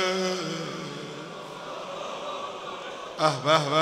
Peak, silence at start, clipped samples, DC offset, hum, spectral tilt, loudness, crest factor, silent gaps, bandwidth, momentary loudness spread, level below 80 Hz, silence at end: -6 dBFS; 0 s; under 0.1%; under 0.1%; none; -4 dB/octave; -29 LUFS; 22 dB; none; 15.5 kHz; 15 LU; -70 dBFS; 0 s